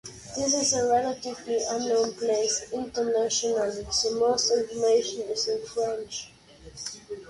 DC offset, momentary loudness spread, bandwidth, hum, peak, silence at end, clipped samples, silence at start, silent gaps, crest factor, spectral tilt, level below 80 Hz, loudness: under 0.1%; 13 LU; 11.5 kHz; none; -12 dBFS; 0 s; under 0.1%; 0.05 s; none; 14 dB; -2 dB/octave; -58 dBFS; -26 LUFS